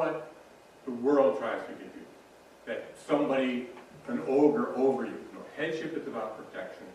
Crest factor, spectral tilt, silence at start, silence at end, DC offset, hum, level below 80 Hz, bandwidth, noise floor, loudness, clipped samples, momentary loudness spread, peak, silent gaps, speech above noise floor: 20 dB; -6 dB/octave; 0 s; 0 s; under 0.1%; none; -74 dBFS; 12.5 kHz; -55 dBFS; -30 LUFS; under 0.1%; 20 LU; -12 dBFS; none; 25 dB